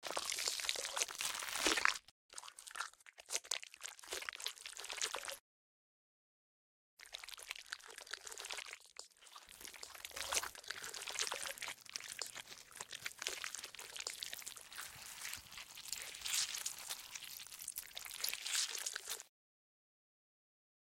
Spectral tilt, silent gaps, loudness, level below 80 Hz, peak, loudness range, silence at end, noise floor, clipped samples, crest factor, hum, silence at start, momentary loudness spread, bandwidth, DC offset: 1.5 dB/octave; 2.11-2.29 s, 5.40-6.97 s; -42 LUFS; -76 dBFS; -12 dBFS; 10 LU; 1.7 s; under -90 dBFS; under 0.1%; 34 dB; none; 0 s; 14 LU; 16.5 kHz; under 0.1%